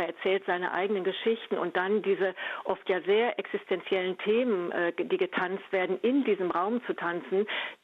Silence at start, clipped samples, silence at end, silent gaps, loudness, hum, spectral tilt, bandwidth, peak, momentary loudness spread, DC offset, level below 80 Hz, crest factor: 0 s; under 0.1%; 0.1 s; none; -29 LUFS; none; -7 dB/octave; 4.6 kHz; -16 dBFS; 5 LU; under 0.1%; -78 dBFS; 14 dB